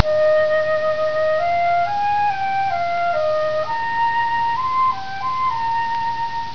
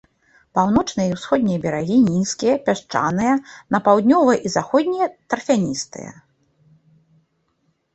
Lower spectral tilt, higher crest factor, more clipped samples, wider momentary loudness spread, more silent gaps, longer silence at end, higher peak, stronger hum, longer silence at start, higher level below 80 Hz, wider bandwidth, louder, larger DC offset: about the same, -4.5 dB/octave vs -5.5 dB/octave; about the same, 18 dB vs 18 dB; neither; second, 5 LU vs 9 LU; neither; second, 0 s vs 1.85 s; about the same, 0 dBFS vs -2 dBFS; neither; second, 0 s vs 0.55 s; about the same, -54 dBFS vs -52 dBFS; second, 5.4 kHz vs 8.4 kHz; about the same, -19 LUFS vs -19 LUFS; first, 3% vs under 0.1%